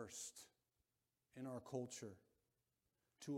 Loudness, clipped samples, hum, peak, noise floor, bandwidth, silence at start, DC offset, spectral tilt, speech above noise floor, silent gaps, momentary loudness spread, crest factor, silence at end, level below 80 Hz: -53 LUFS; under 0.1%; none; -32 dBFS; under -90 dBFS; 16.5 kHz; 0 s; under 0.1%; -4.5 dB/octave; over 38 dB; none; 16 LU; 22 dB; 0 s; -88 dBFS